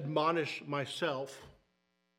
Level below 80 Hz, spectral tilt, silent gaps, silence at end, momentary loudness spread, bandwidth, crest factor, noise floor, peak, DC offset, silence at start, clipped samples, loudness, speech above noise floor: -76 dBFS; -5 dB/octave; none; 0.7 s; 13 LU; 16 kHz; 20 dB; -79 dBFS; -18 dBFS; under 0.1%; 0 s; under 0.1%; -35 LUFS; 44 dB